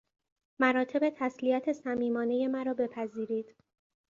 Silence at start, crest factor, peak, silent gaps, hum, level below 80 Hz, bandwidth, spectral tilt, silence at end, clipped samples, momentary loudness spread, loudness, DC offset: 0.6 s; 20 dB; -12 dBFS; none; none; -76 dBFS; 7.4 kHz; -6 dB/octave; 0.7 s; under 0.1%; 8 LU; -31 LUFS; under 0.1%